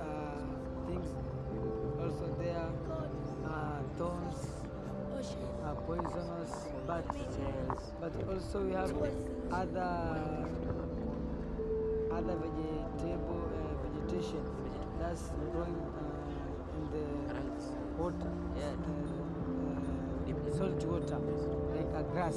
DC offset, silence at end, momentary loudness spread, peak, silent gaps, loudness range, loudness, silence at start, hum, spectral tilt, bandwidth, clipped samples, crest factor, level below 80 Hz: under 0.1%; 0 s; 5 LU; -20 dBFS; none; 3 LU; -38 LUFS; 0 s; none; -7.5 dB/octave; 12 kHz; under 0.1%; 16 dB; -46 dBFS